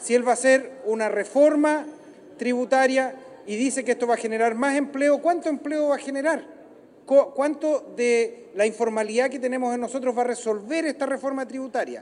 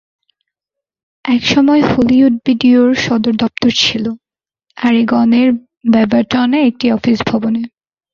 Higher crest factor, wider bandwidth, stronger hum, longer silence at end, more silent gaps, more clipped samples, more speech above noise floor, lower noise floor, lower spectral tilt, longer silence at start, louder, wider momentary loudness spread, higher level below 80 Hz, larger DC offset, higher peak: first, 18 dB vs 12 dB; first, 11 kHz vs 7.2 kHz; neither; second, 0 s vs 0.45 s; second, none vs 5.77-5.81 s; neither; second, 26 dB vs 71 dB; second, -49 dBFS vs -83 dBFS; second, -3.5 dB/octave vs -5 dB/octave; second, 0 s vs 1.25 s; second, -23 LUFS vs -12 LUFS; about the same, 9 LU vs 8 LU; second, -78 dBFS vs -46 dBFS; neither; second, -6 dBFS vs 0 dBFS